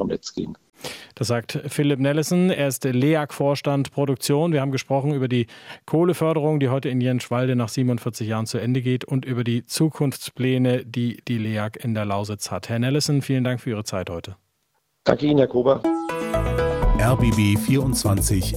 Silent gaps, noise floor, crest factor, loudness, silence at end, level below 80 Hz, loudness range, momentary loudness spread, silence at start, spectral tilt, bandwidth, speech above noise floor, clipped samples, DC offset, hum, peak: none; -71 dBFS; 20 dB; -22 LUFS; 0 s; -36 dBFS; 4 LU; 9 LU; 0 s; -6 dB/octave; 16.5 kHz; 49 dB; under 0.1%; under 0.1%; none; 0 dBFS